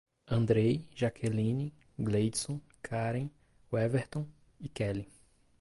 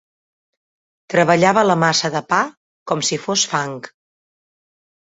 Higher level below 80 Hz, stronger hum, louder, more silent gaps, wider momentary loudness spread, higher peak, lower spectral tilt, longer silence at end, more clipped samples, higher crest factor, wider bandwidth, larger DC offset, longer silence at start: about the same, -58 dBFS vs -62 dBFS; neither; second, -33 LUFS vs -17 LUFS; second, none vs 2.57-2.86 s; about the same, 13 LU vs 11 LU; second, -16 dBFS vs 0 dBFS; first, -6.5 dB/octave vs -3.5 dB/octave; second, 0.55 s vs 1.25 s; neither; about the same, 18 dB vs 20 dB; first, 11.5 kHz vs 8.2 kHz; neither; second, 0.25 s vs 1.1 s